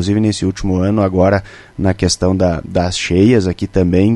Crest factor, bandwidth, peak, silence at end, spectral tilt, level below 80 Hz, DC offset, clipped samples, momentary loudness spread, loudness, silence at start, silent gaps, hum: 14 dB; 11.5 kHz; 0 dBFS; 0 s; -6 dB/octave; -34 dBFS; under 0.1%; under 0.1%; 6 LU; -15 LUFS; 0 s; none; none